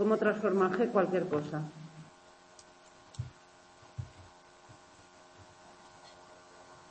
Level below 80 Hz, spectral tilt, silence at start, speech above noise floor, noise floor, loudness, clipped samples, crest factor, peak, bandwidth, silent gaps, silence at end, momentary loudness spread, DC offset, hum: -68 dBFS; -7 dB/octave; 0 s; 29 dB; -59 dBFS; -31 LUFS; under 0.1%; 22 dB; -14 dBFS; 8.8 kHz; none; 0.15 s; 27 LU; under 0.1%; none